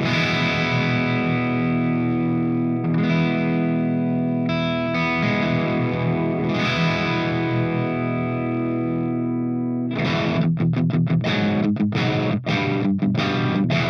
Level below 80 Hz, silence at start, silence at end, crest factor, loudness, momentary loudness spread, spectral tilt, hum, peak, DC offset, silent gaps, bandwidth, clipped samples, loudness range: -54 dBFS; 0 s; 0 s; 12 dB; -21 LUFS; 4 LU; -7.5 dB/octave; none; -8 dBFS; under 0.1%; none; 6.6 kHz; under 0.1%; 2 LU